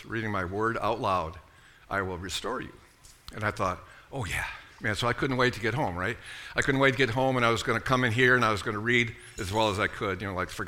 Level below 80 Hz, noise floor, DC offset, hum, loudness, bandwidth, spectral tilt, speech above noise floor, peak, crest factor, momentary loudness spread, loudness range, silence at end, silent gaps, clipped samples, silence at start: -50 dBFS; -51 dBFS; under 0.1%; none; -28 LUFS; 17.5 kHz; -5 dB/octave; 23 dB; -8 dBFS; 20 dB; 12 LU; 8 LU; 0 s; none; under 0.1%; 0 s